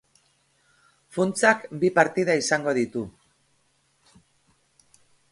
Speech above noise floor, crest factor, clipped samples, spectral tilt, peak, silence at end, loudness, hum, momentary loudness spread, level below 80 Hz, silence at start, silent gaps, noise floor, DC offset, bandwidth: 44 dB; 22 dB; under 0.1%; -4.5 dB/octave; -4 dBFS; 2.2 s; -23 LUFS; none; 12 LU; -66 dBFS; 1.15 s; none; -67 dBFS; under 0.1%; 11.5 kHz